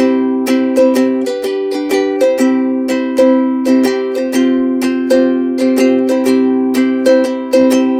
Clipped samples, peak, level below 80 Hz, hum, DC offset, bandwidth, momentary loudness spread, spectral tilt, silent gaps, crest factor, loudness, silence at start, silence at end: under 0.1%; 0 dBFS; -56 dBFS; none; under 0.1%; 16 kHz; 5 LU; -4.5 dB/octave; none; 12 dB; -13 LUFS; 0 s; 0 s